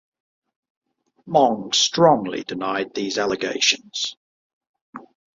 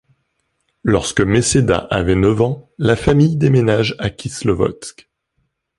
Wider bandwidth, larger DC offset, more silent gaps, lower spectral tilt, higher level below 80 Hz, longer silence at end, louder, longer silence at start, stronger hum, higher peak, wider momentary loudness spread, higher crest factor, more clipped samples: second, 7.8 kHz vs 11.5 kHz; neither; first, 4.17-4.61 s, 4.67-4.74 s, 4.82-4.93 s vs none; second, -3 dB/octave vs -5.5 dB/octave; second, -66 dBFS vs -36 dBFS; second, 0.4 s vs 0.9 s; second, -20 LUFS vs -16 LUFS; first, 1.25 s vs 0.85 s; neither; about the same, -2 dBFS vs 0 dBFS; about the same, 11 LU vs 10 LU; first, 22 dB vs 16 dB; neither